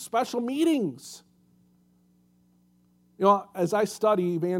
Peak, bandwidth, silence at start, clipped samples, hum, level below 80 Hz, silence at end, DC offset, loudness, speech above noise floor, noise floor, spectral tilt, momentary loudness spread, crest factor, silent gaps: -6 dBFS; 16.5 kHz; 0 s; under 0.1%; 60 Hz at -60 dBFS; -78 dBFS; 0 s; under 0.1%; -25 LUFS; 38 dB; -63 dBFS; -6 dB/octave; 16 LU; 22 dB; none